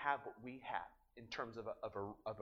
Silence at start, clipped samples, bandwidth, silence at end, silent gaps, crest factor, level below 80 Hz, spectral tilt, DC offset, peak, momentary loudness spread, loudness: 0 s; under 0.1%; 11 kHz; 0 s; none; 24 dB; -74 dBFS; -5.5 dB/octave; under 0.1%; -22 dBFS; 8 LU; -47 LUFS